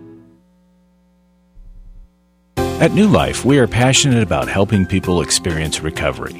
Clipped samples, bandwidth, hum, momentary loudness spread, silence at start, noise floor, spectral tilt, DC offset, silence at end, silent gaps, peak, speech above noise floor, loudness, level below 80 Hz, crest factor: under 0.1%; 16 kHz; 60 Hz at -40 dBFS; 9 LU; 0 s; -56 dBFS; -4.5 dB/octave; under 0.1%; 0 s; none; 0 dBFS; 41 dB; -15 LUFS; -36 dBFS; 18 dB